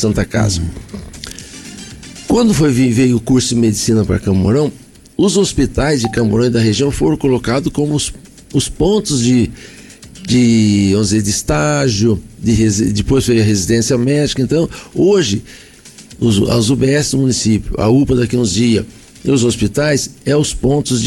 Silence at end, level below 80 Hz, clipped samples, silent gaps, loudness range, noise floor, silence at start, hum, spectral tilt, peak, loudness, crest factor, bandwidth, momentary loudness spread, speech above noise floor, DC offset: 0 s; -32 dBFS; under 0.1%; none; 2 LU; -38 dBFS; 0 s; none; -5.5 dB/octave; -4 dBFS; -14 LUFS; 10 dB; 17 kHz; 10 LU; 25 dB; under 0.1%